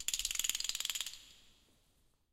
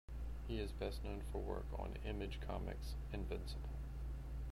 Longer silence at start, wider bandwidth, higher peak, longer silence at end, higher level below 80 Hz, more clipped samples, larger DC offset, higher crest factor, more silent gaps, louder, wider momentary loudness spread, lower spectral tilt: about the same, 0 s vs 0.1 s; first, 17 kHz vs 14.5 kHz; first, -10 dBFS vs -28 dBFS; first, 0.85 s vs 0 s; second, -62 dBFS vs -46 dBFS; neither; neither; first, 32 dB vs 16 dB; neither; first, -36 LUFS vs -47 LUFS; first, 9 LU vs 4 LU; second, 3 dB/octave vs -6.5 dB/octave